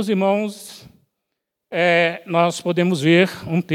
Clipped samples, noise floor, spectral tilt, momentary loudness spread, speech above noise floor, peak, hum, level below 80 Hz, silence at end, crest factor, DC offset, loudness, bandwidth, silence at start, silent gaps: under 0.1%; -79 dBFS; -5.5 dB/octave; 13 LU; 61 dB; -2 dBFS; none; -64 dBFS; 0 s; 18 dB; under 0.1%; -18 LUFS; 15.5 kHz; 0 s; none